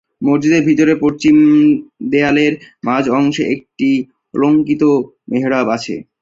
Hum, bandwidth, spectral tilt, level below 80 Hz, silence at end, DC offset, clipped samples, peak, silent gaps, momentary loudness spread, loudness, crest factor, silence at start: none; 7.6 kHz; -6.5 dB/octave; -54 dBFS; 0.2 s; under 0.1%; under 0.1%; 0 dBFS; none; 9 LU; -14 LUFS; 12 dB; 0.2 s